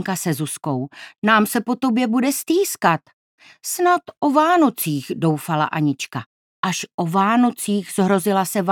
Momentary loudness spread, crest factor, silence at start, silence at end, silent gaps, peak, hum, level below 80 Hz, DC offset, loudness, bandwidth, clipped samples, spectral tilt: 10 LU; 18 dB; 0 s; 0 s; 1.18-1.22 s, 3.13-3.38 s, 6.26-6.63 s, 6.94-6.98 s; 0 dBFS; none; -72 dBFS; under 0.1%; -20 LUFS; 19 kHz; under 0.1%; -5 dB/octave